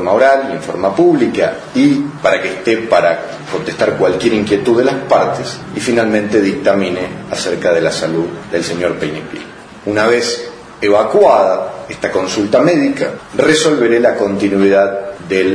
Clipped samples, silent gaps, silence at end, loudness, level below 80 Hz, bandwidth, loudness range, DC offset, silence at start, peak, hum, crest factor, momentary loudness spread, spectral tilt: under 0.1%; none; 0 s; -13 LUFS; -48 dBFS; 10.5 kHz; 4 LU; under 0.1%; 0 s; 0 dBFS; none; 14 dB; 11 LU; -5 dB/octave